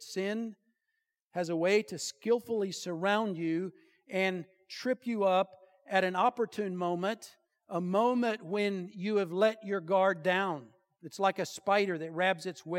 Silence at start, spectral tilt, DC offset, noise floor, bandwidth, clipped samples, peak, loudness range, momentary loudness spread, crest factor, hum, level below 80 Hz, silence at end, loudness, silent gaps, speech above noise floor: 0 s; -5 dB/octave; under 0.1%; -84 dBFS; 16.5 kHz; under 0.1%; -12 dBFS; 2 LU; 10 LU; 20 dB; none; -88 dBFS; 0 s; -32 LUFS; 1.22-1.31 s; 53 dB